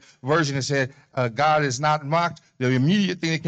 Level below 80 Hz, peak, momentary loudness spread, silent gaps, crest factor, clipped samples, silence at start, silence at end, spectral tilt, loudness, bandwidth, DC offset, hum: -60 dBFS; -10 dBFS; 7 LU; none; 12 dB; under 0.1%; 0.25 s; 0 s; -5.5 dB/octave; -22 LUFS; 8.8 kHz; under 0.1%; none